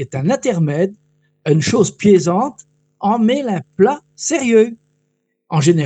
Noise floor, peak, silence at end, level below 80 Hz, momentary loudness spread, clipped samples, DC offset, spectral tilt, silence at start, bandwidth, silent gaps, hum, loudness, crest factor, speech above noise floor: -68 dBFS; -2 dBFS; 0 s; -56 dBFS; 9 LU; under 0.1%; under 0.1%; -6 dB/octave; 0 s; 9.2 kHz; none; none; -16 LUFS; 16 dB; 53 dB